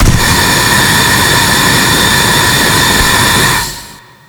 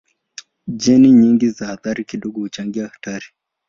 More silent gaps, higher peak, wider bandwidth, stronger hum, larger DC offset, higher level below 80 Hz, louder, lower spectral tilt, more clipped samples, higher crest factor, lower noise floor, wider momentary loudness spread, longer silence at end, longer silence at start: neither; about the same, 0 dBFS vs -2 dBFS; first, over 20 kHz vs 7.4 kHz; neither; neither; first, -22 dBFS vs -56 dBFS; first, -7 LUFS vs -16 LUFS; second, -2.5 dB/octave vs -6 dB/octave; first, 0.5% vs under 0.1%; second, 8 dB vs 14 dB; second, -32 dBFS vs -41 dBFS; second, 2 LU vs 19 LU; about the same, 0.3 s vs 0.4 s; second, 0 s vs 0.65 s